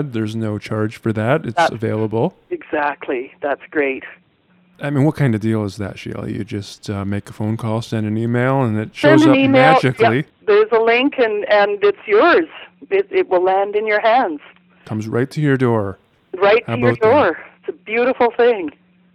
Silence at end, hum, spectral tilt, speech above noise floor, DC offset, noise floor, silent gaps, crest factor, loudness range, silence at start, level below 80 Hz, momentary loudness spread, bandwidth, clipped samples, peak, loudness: 0.45 s; none; -7 dB/octave; 39 dB; under 0.1%; -56 dBFS; none; 16 dB; 8 LU; 0 s; -58 dBFS; 15 LU; 12.5 kHz; under 0.1%; 0 dBFS; -17 LUFS